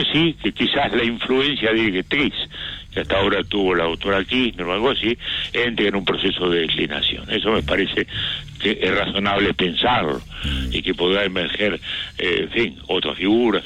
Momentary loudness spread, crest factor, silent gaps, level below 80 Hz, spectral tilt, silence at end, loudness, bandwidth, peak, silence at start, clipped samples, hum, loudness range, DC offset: 5 LU; 12 dB; none; -38 dBFS; -5.5 dB/octave; 0 s; -20 LUFS; 10.5 kHz; -8 dBFS; 0 s; under 0.1%; none; 1 LU; under 0.1%